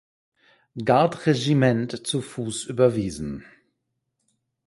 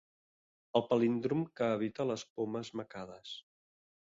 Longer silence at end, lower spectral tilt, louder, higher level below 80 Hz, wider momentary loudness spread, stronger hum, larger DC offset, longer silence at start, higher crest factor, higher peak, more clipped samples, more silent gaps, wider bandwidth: first, 1.25 s vs 0.65 s; about the same, -6 dB/octave vs -6.5 dB/octave; first, -23 LUFS vs -35 LUFS; first, -54 dBFS vs -76 dBFS; about the same, 14 LU vs 16 LU; neither; neither; about the same, 0.75 s vs 0.75 s; about the same, 20 dB vs 22 dB; first, -4 dBFS vs -14 dBFS; neither; second, none vs 2.30-2.36 s; first, 11.5 kHz vs 7.8 kHz